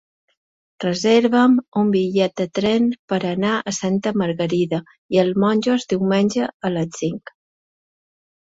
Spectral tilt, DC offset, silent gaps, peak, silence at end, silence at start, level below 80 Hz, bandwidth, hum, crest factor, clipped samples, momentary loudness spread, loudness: -5.5 dB/octave; under 0.1%; 1.68-1.72 s, 2.99-3.08 s, 4.98-5.09 s, 6.54-6.60 s; -4 dBFS; 1.3 s; 0.8 s; -60 dBFS; 8 kHz; none; 16 dB; under 0.1%; 8 LU; -19 LUFS